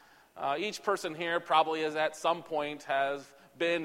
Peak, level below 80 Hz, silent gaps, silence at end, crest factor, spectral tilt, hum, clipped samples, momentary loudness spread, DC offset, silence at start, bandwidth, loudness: -12 dBFS; -78 dBFS; none; 0 s; 20 dB; -3.5 dB/octave; none; under 0.1%; 8 LU; under 0.1%; 0.35 s; 16.5 kHz; -32 LUFS